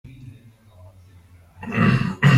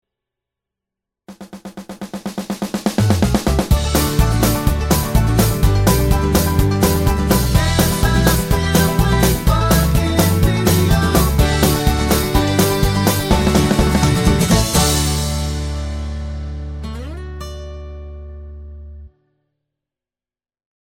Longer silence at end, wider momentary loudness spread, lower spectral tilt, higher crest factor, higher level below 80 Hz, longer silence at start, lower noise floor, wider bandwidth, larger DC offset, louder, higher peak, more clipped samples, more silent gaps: second, 0 s vs 1.85 s; first, 25 LU vs 17 LU; first, -7 dB/octave vs -5 dB/octave; about the same, 16 dB vs 16 dB; second, -48 dBFS vs -22 dBFS; second, 0.05 s vs 1.3 s; second, -49 dBFS vs under -90 dBFS; second, 10.5 kHz vs 17 kHz; neither; second, -20 LUFS vs -16 LUFS; second, -6 dBFS vs 0 dBFS; neither; neither